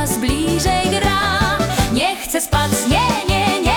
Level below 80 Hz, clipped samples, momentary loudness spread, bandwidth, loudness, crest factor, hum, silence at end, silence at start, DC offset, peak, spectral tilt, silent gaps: -28 dBFS; under 0.1%; 2 LU; 19 kHz; -17 LUFS; 12 dB; none; 0 s; 0 s; under 0.1%; -4 dBFS; -4 dB/octave; none